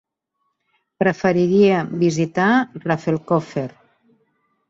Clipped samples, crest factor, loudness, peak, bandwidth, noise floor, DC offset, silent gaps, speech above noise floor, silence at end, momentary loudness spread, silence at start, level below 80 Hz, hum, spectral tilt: under 0.1%; 16 dB; -19 LUFS; -4 dBFS; 7.8 kHz; -74 dBFS; under 0.1%; none; 56 dB; 1 s; 9 LU; 1 s; -60 dBFS; none; -7 dB/octave